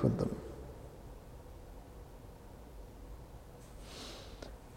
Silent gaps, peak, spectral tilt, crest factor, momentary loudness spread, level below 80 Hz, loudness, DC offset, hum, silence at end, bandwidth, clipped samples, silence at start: none; -16 dBFS; -7 dB/octave; 26 dB; 14 LU; -52 dBFS; -46 LUFS; under 0.1%; none; 0 s; 16.5 kHz; under 0.1%; 0 s